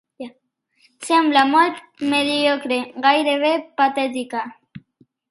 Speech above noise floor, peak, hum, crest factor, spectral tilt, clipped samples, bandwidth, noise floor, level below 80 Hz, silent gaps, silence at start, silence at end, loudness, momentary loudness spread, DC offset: 47 dB; 0 dBFS; none; 20 dB; -3 dB/octave; under 0.1%; 11.5 kHz; -65 dBFS; -70 dBFS; none; 0.2 s; 0.5 s; -19 LUFS; 19 LU; under 0.1%